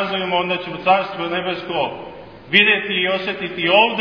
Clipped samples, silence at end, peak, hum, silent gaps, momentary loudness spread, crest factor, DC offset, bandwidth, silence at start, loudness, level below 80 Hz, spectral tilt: under 0.1%; 0 s; 0 dBFS; none; none; 10 LU; 18 dB; 0.1%; 5.4 kHz; 0 s; -18 LUFS; -58 dBFS; -6 dB/octave